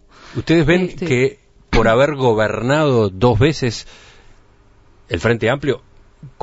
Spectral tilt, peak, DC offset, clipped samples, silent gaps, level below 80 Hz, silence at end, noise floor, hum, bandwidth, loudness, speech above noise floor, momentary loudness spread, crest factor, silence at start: -6.5 dB/octave; 0 dBFS; under 0.1%; under 0.1%; none; -32 dBFS; 0.15 s; -49 dBFS; none; 8 kHz; -17 LUFS; 34 dB; 10 LU; 16 dB; 0.3 s